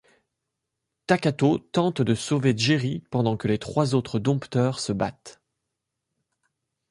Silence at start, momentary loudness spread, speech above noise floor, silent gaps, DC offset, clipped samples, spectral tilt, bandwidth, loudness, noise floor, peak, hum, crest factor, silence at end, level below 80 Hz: 1.1 s; 5 LU; 59 dB; none; under 0.1%; under 0.1%; -6 dB/octave; 11.5 kHz; -24 LUFS; -82 dBFS; -6 dBFS; none; 20 dB; 1.6 s; -58 dBFS